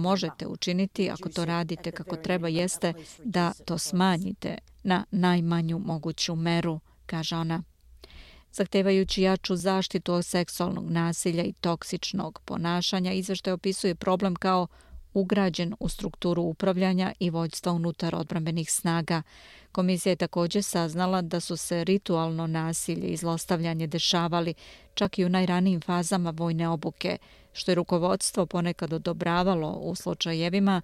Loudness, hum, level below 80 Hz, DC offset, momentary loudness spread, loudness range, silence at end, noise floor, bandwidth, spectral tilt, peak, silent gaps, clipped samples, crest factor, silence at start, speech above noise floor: -28 LUFS; none; -54 dBFS; under 0.1%; 8 LU; 2 LU; 0 s; -50 dBFS; 13.5 kHz; -5 dB/octave; -12 dBFS; none; under 0.1%; 14 dB; 0 s; 23 dB